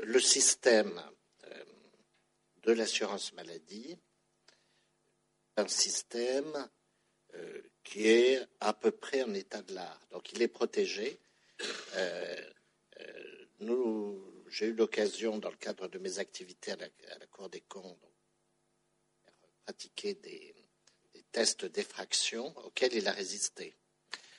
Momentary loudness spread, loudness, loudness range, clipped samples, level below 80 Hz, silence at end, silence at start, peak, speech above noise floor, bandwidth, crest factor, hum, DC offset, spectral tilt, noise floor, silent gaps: 23 LU; -33 LUFS; 15 LU; under 0.1%; -86 dBFS; 0.2 s; 0 s; -12 dBFS; 43 dB; 11.5 kHz; 24 dB; none; under 0.1%; -1.5 dB/octave; -77 dBFS; none